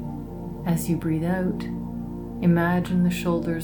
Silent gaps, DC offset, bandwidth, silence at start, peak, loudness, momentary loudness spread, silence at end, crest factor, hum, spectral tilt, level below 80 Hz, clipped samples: none; under 0.1%; 19 kHz; 0 s; -10 dBFS; -25 LUFS; 12 LU; 0 s; 16 dB; none; -7 dB/octave; -44 dBFS; under 0.1%